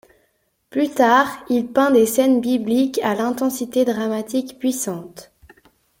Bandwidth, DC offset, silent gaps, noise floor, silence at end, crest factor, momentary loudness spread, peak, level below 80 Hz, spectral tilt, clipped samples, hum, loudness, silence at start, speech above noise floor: 17 kHz; under 0.1%; none; -66 dBFS; 0.8 s; 18 dB; 10 LU; -2 dBFS; -62 dBFS; -4 dB/octave; under 0.1%; none; -19 LUFS; 0.75 s; 48 dB